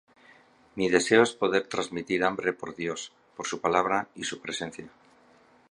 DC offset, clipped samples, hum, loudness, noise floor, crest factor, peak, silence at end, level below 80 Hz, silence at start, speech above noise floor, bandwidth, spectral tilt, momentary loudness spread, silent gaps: under 0.1%; under 0.1%; none; -27 LUFS; -59 dBFS; 24 dB; -4 dBFS; 0.85 s; -66 dBFS; 0.75 s; 32 dB; 11.5 kHz; -3.5 dB/octave; 16 LU; none